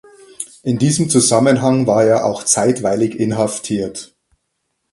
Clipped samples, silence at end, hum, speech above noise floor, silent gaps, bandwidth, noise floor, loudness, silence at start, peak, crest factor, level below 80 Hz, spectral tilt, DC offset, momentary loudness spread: under 0.1%; 0.85 s; none; 56 dB; none; 11.5 kHz; -71 dBFS; -15 LUFS; 0.4 s; 0 dBFS; 16 dB; -54 dBFS; -5 dB/octave; under 0.1%; 13 LU